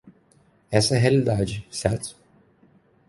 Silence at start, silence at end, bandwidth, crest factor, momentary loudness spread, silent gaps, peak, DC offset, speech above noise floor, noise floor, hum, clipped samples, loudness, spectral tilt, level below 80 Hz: 0.05 s; 0.95 s; 11.5 kHz; 22 dB; 10 LU; none; -2 dBFS; under 0.1%; 38 dB; -60 dBFS; none; under 0.1%; -23 LUFS; -5.5 dB/octave; -48 dBFS